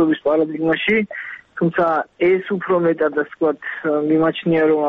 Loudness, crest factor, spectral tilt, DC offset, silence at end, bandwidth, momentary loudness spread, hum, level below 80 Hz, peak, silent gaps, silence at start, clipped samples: -19 LUFS; 12 dB; -9 dB/octave; under 0.1%; 0 s; 4.5 kHz; 5 LU; none; -58 dBFS; -6 dBFS; none; 0 s; under 0.1%